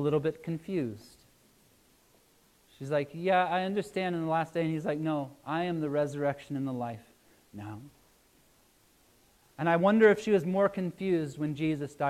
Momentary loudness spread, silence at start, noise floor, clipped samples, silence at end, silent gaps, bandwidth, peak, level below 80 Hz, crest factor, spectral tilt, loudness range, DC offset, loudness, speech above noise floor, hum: 17 LU; 0 s; -65 dBFS; under 0.1%; 0 s; none; 14.5 kHz; -10 dBFS; -68 dBFS; 22 dB; -7 dB/octave; 9 LU; under 0.1%; -30 LUFS; 35 dB; none